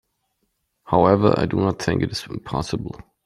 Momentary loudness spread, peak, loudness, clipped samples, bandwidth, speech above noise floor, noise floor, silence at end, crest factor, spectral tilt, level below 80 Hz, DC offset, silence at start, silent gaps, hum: 13 LU; -2 dBFS; -21 LUFS; under 0.1%; 13 kHz; 52 dB; -72 dBFS; 0.3 s; 20 dB; -6.5 dB/octave; -46 dBFS; under 0.1%; 0.85 s; none; none